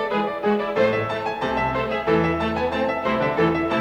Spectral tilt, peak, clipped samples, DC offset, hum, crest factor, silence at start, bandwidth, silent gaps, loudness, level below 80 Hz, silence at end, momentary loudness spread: -7 dB/octave; -6 dBFS; under 0.1%; under 0.1%; none; 16 dB; 0 s; 9.2 kHz; none; -22 LUFS; -46 dBFS; 0 s; 4 LU